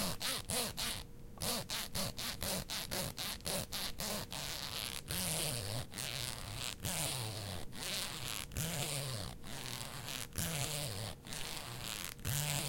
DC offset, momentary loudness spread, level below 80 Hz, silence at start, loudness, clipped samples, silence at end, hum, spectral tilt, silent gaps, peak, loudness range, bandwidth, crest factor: under 0.1%; 6 LU; -54 dBFS; 0 s; -39 LUFS; under 0.1%; 0 s; none; -2.5 dB/octave; none; -18 dBFS; 2 LU; 17 kHz; 22 dB